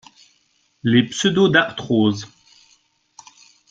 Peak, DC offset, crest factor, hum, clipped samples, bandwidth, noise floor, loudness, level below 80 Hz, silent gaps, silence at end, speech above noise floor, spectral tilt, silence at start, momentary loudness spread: -2 dBFS; under 0.1%; 20 dB; none; under 0.1%; 9.2 kHz; -63 dBFS; -18 LUFS; -58 dBFS; none; 1.45 s; 46 dB; -5 dB/octave; 0.85 s; 12 LU